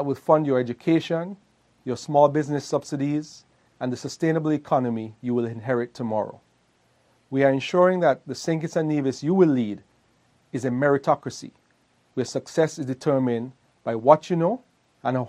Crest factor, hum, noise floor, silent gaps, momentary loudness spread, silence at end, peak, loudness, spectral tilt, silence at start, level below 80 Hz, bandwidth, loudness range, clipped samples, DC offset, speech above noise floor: 22 dB; none; -64 dBFS; none; 14 LU; 0 s; -2 dBFS; -24 LUFS; -6.5 dB/octave; 0 s; -70 dBFS; 11.5 kHz; 4 LU; under 0.1%; under 0.1%; 41 dB